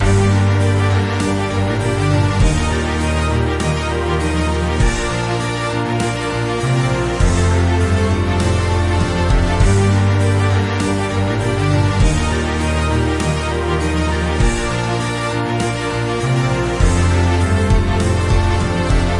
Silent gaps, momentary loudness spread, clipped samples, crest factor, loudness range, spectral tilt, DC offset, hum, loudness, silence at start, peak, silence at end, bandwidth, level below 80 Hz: none; 4 LU; under 0.1%; 14 dB; 2 LU; -6 dB/octave; under 0.1%; none; -17 LUFS; 0 s; -2 dBFS; 0 s; 11.5 kHz; -24 dBFS